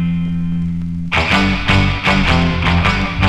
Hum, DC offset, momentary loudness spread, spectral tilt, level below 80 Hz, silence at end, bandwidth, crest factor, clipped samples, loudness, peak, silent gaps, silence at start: none; under 0.1%; 7 LU; -6 dB/octave; -24 dBFS; 0 s; 10.5 kHz; 14 dB; under 0.1%; -15 LUFS; 0 dBFS; none; 0 s